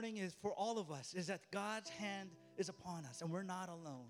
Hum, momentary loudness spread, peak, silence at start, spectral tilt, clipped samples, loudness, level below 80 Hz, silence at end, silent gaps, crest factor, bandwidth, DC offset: none; 7 LU; -30 dBFS; 0 s; -4.5 dB/octave; under 0.1%; -46 LUFS; -84 dBFS; 0 s; none; 16 dB; 16 kHz; under 0.1%